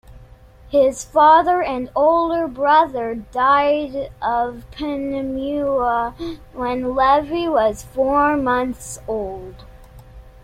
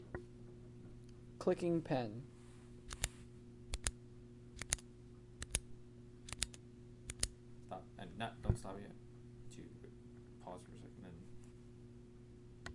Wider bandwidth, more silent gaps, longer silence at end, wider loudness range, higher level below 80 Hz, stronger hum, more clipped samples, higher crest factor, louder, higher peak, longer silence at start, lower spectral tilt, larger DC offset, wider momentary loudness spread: first, 15.5 kHz vs 11.5 kHz; neither; first, 0.15 s vs 0 s; second, 5 LU vs 13 LU; first, -44 dBFS vs -56 dBFS; neither; neither; second, 16 dB vs 34 dB; first, -18 LUFS vs -44 LUFS; first, -2 dBFS vs -12 dBFS; first, 0.15 s vs 0 s; about the same, -4.5 dB/octave vs -4 dB/octave; neither; second, 12 LU vs 18 LU